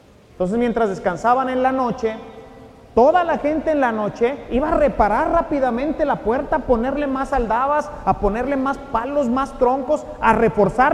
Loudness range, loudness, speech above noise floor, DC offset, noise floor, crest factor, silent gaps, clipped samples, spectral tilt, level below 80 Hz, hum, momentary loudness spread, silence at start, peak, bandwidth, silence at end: 2 LU; -19 LUFS; 24 dB; under 0.1%; -42 dBFS; 18 dB; none; under 0.1%; -7 dB/octave; -36 dBFS; none; 6 LU; 0.4 s; 0 dBFS; 11.5 kHz; 0 s